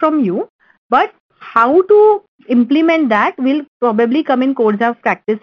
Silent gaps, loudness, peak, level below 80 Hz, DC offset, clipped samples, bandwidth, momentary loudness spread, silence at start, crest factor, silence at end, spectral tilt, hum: 0.49-0.59 s, 0.78-0.90 s, 1.20-1.29 s, 2.28-2.39 s, 3.68-3.80 s; -14 LUFS; 0 dBFS; -60 dBFS; under 0.1%; under 0.1%; 6.4 kHz; 8 LU; 0 s; 14 dB; 0.05 s; -7.5 dB/octave; none